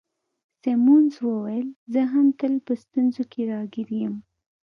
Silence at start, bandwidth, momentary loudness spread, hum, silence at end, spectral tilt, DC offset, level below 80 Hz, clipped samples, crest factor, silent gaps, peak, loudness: 0.65 s; 6.2 kHz; 13 LU; none; 0.45 s; -8.5 dB/octave; under 0.1%; -76 dBFS; under 0.1%; 14 dB; 1.76-1.86 s; -8 dBFS; -23 LUFS